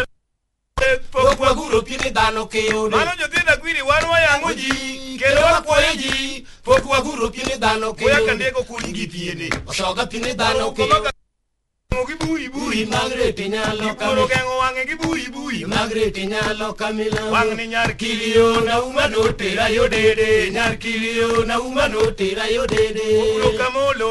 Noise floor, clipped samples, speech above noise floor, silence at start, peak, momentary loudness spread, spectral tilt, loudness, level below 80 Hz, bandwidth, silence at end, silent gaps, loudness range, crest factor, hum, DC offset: -72 dBFS; under 0.1%; 53 dB; 0 s; -2 dBFS; 8 LU; -3.5 dB/octave; -18 LUFS; -36 dBFS; 11.5 kHz; 0 s; none; 4 LU; 18 dB; none; under 0.1%